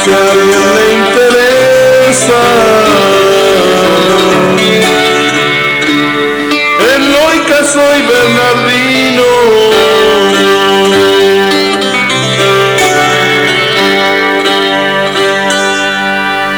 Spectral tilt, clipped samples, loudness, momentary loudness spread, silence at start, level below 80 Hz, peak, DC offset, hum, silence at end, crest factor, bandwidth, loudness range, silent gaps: -3 dB/octave; under 0.1%; -7 LUFS; 3 LU; 0 s; -40 dBFS; 0 dBFS; 0.2%; none; 0 s; 8 dB; over 20 kHz; 2 LU; none